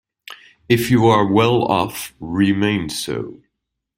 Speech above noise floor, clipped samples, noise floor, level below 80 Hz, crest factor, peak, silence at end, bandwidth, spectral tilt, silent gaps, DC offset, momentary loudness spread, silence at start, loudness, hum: 61 dB; under 0.1%; -78 dBFS; -50 dBFS; 18 dB; -2 dBFS; 0.65 s; 16 kHz; -5.5 dB/octave; none; under 0.1%; 19 LU; 0.3 s; -17 LUFS; none